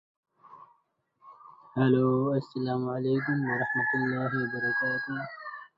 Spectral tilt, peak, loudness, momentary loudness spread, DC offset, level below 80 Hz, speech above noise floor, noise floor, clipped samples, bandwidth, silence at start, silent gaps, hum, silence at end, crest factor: -9.5 dB/octave; -12 dBFS; -28 LUFS; 11 LU; under 0.1%; -70 dBFS; 44 dB; -72 dBFS; under 0.1%; 5.4 kHz; 0.5 s; none; none; 0.1 s; 18 dB